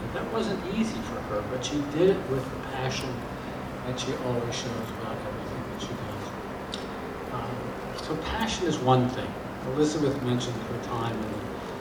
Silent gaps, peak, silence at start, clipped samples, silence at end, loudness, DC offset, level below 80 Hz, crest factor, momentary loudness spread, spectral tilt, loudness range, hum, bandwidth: none; -10 dBFS; 0 s; under 0.1%; 0 s; -30 LUFS; under 0.1%; -48 dBFS; 20 dB; 11 LU; -5.5 dB/octave; 6 LU; none; over 20 kHz